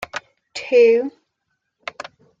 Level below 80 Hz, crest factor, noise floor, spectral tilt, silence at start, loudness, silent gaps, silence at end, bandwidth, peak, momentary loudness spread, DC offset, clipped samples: -66 dBFS; 16 dB; -75 dBFS; -3.5 dB/octave; 0 s; -16 LUFS; none; 1.3 s; 7.8 kHz; -4 dBFS; 22 LU; under 0.1%; under 0.1%